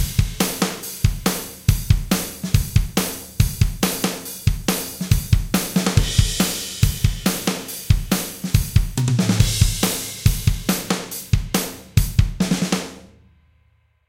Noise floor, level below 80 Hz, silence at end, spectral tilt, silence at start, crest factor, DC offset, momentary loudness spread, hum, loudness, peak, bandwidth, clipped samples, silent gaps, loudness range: -60 dBFS; -26 dBFS; 1 s; -4.5 dB/octave; 0 s; 20 dB; under 0.1%; 5 LU; none; -21 LUFS; 0 dBFS; 17 kHz; under 0.1%; none; 2 LU